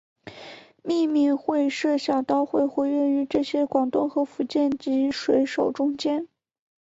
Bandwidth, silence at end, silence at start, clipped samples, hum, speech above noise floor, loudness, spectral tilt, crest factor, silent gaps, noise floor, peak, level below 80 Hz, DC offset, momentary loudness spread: 7.8 kHz; 0.6 s; 0.25 s; under 0.1%; none; 22 dB; -24 LUFS; -5 dB/octave; 16 dB; none; -45 dBFS; -8 dBFS; -64 dBFS; under 0.1%; 8 LU